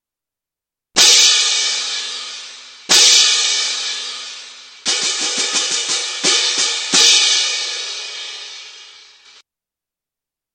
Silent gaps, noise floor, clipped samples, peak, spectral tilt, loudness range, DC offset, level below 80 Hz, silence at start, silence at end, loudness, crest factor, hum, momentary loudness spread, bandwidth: none; -87 dBFS; under 0.1%; 0 dBFS; 2.5 dB/octave; 5 LU; under 0.1%; -66 dBFS; 0.95 s; 1.65 s; -12 LUFS; 18 dB; none; 20 LU; 16.5 kHz